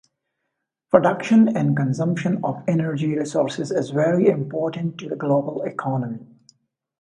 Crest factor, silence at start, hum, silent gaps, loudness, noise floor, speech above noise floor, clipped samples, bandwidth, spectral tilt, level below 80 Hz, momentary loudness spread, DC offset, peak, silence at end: 22 dB; 0.95 s; none; none; -21 LUFS; -79 dBFS; 59 dB; under 0.1%; 9.8 kHz; -7.5 dB/octave; -64 dBFS; 10 LU; under 0.1%; 0 dBFS; 0.75 s